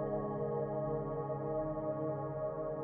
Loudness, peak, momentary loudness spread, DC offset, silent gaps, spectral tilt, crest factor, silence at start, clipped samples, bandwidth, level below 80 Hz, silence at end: -38 LUFS; -26 dBFS; 2 LU; under 0.1%; none; -11 dB/octave; 12 dB; 0 s; under 0.1%; 3.3 kHz; -58 dBFS; 0 s